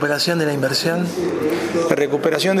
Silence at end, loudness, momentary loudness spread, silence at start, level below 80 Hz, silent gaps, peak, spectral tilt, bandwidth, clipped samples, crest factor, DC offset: 0 s; -19 LUFS; 3 LU; 0 s; -58 dBFS; none; 0 dBFS; -4.5 dB/octave; 15.5 kHz; under 0.1%; 18 dB; under 0.1%